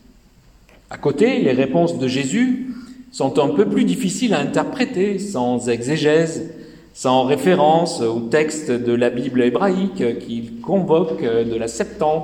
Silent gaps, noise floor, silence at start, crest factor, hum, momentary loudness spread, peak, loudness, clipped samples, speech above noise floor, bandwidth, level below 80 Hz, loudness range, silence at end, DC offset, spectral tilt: none; -50 dBFS; 0.9 s; 16 dB; none; 8 LU; -2 dBFS; -19 LUFS; under 0.1%; 32 dB; 15.5 kHz; -52 dBFS; 2 LU; 0 s; under 0.1%; -5.5 dB/octave